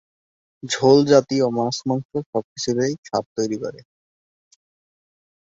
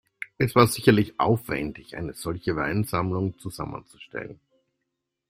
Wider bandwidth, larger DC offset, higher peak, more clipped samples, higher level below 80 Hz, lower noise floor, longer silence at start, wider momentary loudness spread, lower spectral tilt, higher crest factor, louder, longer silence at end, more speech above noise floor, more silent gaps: second, 8 kHz vs 16 kHz; neither; about the same, -2 dBFS vs -2 dBFS; neither; second, -62 dBFS vs -52 dBFS; first, under -90 dBFS vs -81 dBFS; first, 0.65 s vs 0.2 s; second, 13 LU vs 17 LU; about the same, -5 dB/octave vs -6 dB/octave; about the same, 20 dB vs 24 dB; first, -20 LUFS vs -25 LUFS; first, 1.75 s vs 0.95 s; first, over 70 dB vs 57 dB; first, 2.05-2.09 s, 2.26-2.33 s, 2.44-2.56 s, 2.98-3.03 s, 3.26-3.36 s vs none